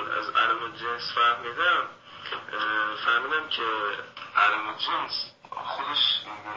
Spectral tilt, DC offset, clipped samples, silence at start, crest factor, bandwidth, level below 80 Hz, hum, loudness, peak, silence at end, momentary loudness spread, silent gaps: -2.5 dB/octave; under 0.1%; under 0.1%; 0 s; 18 dB; 7.6 kHz; -70 dBFS; none; -26 LUFS; -8 dBFS; 0 s; 13 LU; none